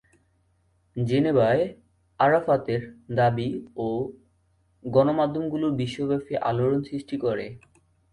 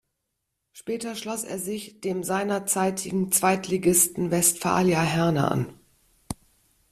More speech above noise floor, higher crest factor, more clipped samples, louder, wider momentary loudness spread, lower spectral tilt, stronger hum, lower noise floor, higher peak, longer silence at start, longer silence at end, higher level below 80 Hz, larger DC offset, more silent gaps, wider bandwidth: second, 42 dB vs 55 dB; about the same, 18 dB vs 20 dB; neither; about the same, -25 LUFS vs -24 LUFS; second, 10 LU vs 14 LU; first, -8 dB/octave vs -4 dB/octave; neither; second, -66 dBFS vs -80 dBFS; about the same, -8 dBFS vs -6 dBFS; first, 0.95 s vs 0.75 s; about the same, 0.55 s vs 0.6 s; about the same, -58 dBFS vs -56 dBFS; neither; neither; second, 11 kHz vs 15.5 kHz